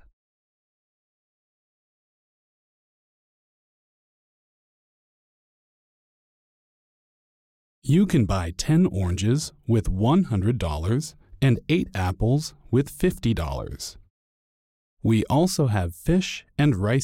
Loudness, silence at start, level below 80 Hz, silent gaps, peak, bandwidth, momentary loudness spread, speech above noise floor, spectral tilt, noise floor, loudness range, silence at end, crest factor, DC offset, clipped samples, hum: -23 LUFS; 7.85 s; -40 dBFS; 14.10-14.97 s; -10 dBFS; 16.5 kHz; 8 LU; over 68 dB; -6.5 dB/octave; under -90 dBFS; 4 LU; 0 s; 14 dB; under 0.1%; under 0.1%; none